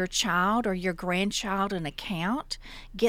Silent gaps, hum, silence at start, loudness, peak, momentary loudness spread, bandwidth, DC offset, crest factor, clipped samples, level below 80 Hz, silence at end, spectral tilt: none; none; 0 s; -28 LUFS; -10 dBFS; 10 LU; 16.5 kHz; under 0.1%; 18 dB; under 0.1%; -48 dBFS; 0 s; -4 dB/octave